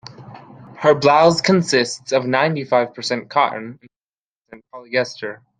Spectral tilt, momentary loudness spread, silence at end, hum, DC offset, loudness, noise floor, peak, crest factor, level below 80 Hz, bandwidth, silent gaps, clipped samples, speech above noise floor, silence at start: -4.5 dB/octave; 14 LU; 0.25 s; none; under 0.1%; -17 LUFS; under -90 dBFS; -2 dBFS; 18 dB; -62 dBFS; 9.8 kHz; 3.96-4.13 s, 4.21-4.45 s; under 0.1%; over 72 dB; 0.05 s